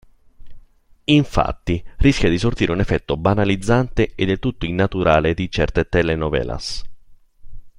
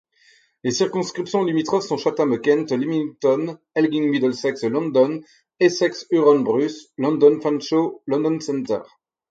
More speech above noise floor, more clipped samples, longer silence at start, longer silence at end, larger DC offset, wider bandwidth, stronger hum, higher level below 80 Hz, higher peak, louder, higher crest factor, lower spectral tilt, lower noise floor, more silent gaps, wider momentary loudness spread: second, 31 dB vs 37 dB; neither; second, 0.4 s vs 0.65 s; second, 0.1 s vs 0.45 s; neither; first, 11.5 kHz vs 7.8 kHz; neither; first, -32 dBFS vs -70 dBFS; about the same, 0 dBFS vs -2 dBFS; about the same, -19 LUFS vs -21 LUFS; about the same, 20 dB vs 18 dB; about the same, -6.5 dB/octave vs -5.5 dB/octave; second, -49 dBFS vs -57 dBFS; neither; about the same, 9 LU vs 9 LU